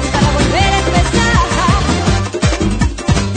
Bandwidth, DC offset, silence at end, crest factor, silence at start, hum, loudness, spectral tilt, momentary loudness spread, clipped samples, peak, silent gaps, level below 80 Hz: 9.4 kHz; under 0.1%; 0 s; 12 dB; 0 s; none; -13 LUFS; -5 dB/octave; 4 LU; under 0.1%; 0 dBFS; none; -20 dBFS